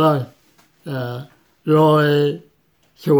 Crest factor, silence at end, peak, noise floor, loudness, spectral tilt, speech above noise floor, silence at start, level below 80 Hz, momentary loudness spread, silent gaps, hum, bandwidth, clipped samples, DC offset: 14 dB; 0 s; -4 dBFS; -60 dBFS; -18 LUFS; -8 dB/octave; 44 dB; 0 s; -64 dBFS; 20 LU; none; none; over 20 kHz; under 0.1%; under 0.1%